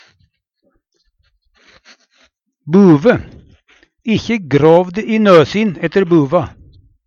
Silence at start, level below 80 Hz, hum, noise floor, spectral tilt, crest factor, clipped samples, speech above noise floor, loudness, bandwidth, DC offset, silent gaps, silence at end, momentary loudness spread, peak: 2.65 s; -46 dBFS; none; -63 dBFS; -7.5 dB/octave; 14 dB; under 0.1%; 52 dB; -12 LUFS; 7.2 kHz; under 0.1%; none; 0.6 s; 9 LU; 0 dBFS